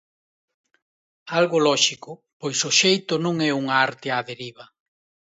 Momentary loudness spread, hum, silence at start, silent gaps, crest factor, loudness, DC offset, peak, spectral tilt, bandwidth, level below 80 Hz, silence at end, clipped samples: 18 LU; none; 1.25 s; 2.33-2.40 s; 22 dB; -20 LUFS; under 0.1%; -2 dBFS; -3 dB/octave; 8.2 kHz; -74 dBFS; 0.65 s; under 0.1%